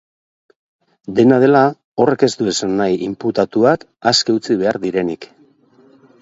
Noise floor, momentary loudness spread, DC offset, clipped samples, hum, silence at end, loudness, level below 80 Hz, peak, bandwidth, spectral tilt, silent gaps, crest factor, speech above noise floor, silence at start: -51 dBFS; 9 LU; under 0.1%; under 0.1%; none; 0.95 s; -16 LUFS; -56 dBFS; 0 dBFS; 8 kHz; -5 dB/octave; 1.84-1.95 s; 16 dB; 36 dB; 1.1 s